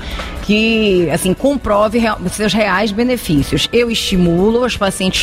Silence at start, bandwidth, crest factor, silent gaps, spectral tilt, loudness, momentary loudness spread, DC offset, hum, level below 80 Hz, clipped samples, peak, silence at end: 0 s; 16 kHz; 12 dB; none; -5 dB/octave; -14 LUFS; 4 LU; under 0.1%; none; -30 dBFS; under 0.1%; -2 dBFS; 0 s